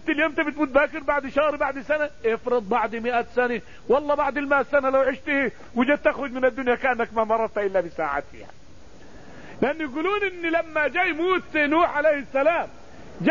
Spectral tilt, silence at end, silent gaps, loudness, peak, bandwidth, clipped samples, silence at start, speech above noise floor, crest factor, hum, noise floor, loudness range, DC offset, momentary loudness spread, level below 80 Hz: -6 dB/octave; 0 s; none; -23 LUFS; -6 dBFS; 7.4 kHz; under 0.1%; 0.05 s; 25 dB; 18 dB; none; -49 dBFS; 4 LU; 0.8%; 6 LU; -52 dBFS